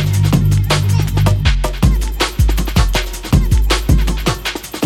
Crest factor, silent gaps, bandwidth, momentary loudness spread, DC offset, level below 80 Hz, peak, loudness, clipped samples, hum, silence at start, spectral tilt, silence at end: 12 dB; none; 17 kHz; 4 LU; under 0.1%; -18 dBFS; 0 dBFS; -15 LUFS; under 0.1%; none; 0 s; -5 dB/octave; 0 s